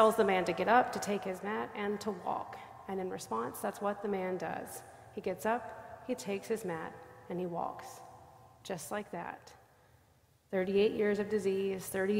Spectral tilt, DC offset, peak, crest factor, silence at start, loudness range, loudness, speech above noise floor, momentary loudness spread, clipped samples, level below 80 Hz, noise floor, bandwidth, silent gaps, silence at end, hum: -5 dB/octave; under 0.1%; -12 dBFS; 22 dB; 0 s; 8 LU; -35 LUFS; 33 dB; 18 LU; under 0.1%; -70 dBFS; -67 dBFS; 16 kHz; none; 0 s; none